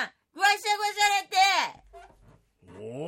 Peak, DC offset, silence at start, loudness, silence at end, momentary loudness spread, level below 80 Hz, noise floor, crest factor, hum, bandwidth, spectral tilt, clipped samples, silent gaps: -10 dBFS; under 0.1%; 0 s; -24 LUFS; 0 s; 14 LU; -66 dBFS; -59 dBFS; 18 dB; none; 16.5 kHz; -0.5 dB/octave; under 0.1%; none